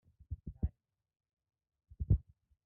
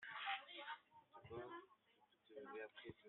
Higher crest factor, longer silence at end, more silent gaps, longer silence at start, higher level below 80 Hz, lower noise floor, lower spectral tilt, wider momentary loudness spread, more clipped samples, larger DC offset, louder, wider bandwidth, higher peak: about the same, 24 dB vs 22 dB; first, 0.45 s vs 0 s; first, 1.33-1.37 s vs none; first, 0.3 s vs 0 s; first, -44 dBFS vs -86 dBFS; second, -65 dBFS vs -78 dBFS; first, -15 dB/octave vs -1 dB/octave; about the same, 14 LU vs 15 LU; neither; neither; first, -39 LUFS vs -53 LUFS; second, 1 kHz vs 4.2 kHz; first, -18 dBFS vs -32 dBFS